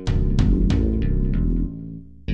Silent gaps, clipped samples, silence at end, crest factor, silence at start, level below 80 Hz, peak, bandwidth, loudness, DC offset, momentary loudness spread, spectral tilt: none; under 0.1%; 0 s; 14 dB; 0 s; -22 dBFS; -6 dBFS; 7.6 kHz; -22 LUFS; 1%; 15 LU; -8.5 dB/octave